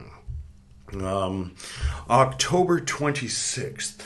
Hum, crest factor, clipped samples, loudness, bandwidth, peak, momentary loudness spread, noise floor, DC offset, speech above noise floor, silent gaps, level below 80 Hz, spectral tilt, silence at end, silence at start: none; 22 dB; under 0.1%; -25 LUFS; 12.5 kHz; -4 dBFS; 19 LU; -47 dBFS; under 0.1%; 22 dB; none; -40 dBFS; -4 dB/octave; 0 s; 0 s